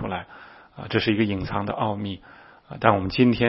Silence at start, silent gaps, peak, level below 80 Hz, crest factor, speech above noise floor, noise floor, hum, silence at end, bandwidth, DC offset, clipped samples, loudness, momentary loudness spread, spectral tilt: 0 s; none; 0 dBFS; -50 dBFS; 24 dB; 24 dB; -47 dBFS; none; 0 s; 5.8 kHz; under 0.1%; under 0.1%; -24 LUFS; 22 LU; -10.5 dB/octave